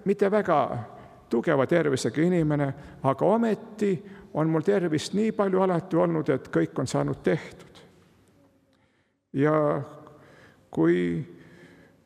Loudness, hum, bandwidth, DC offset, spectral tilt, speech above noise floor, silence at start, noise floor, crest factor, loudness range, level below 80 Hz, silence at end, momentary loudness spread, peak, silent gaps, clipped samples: -26 LUFS; none; 12.5 kHz; under 0.1%; -7 dB/octave; 44 dB; 0.05 s; -69 dBFS; 18 dB; 5 LU; -62 dBFS; 0.7 s; 10 LU; -8 dBFS; none; under 0.1%